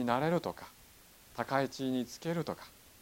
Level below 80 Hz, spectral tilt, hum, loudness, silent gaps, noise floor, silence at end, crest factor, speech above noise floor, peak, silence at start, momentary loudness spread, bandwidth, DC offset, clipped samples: -68 dBFS; -6 dB/octave; none; -35 LUFS; none; -59 dBFS; 0.3 s; 22 dB; 25 dB; -14 dBFS; 0 s; 17 LU; 17 kHz; under 0.1%; under 0.1%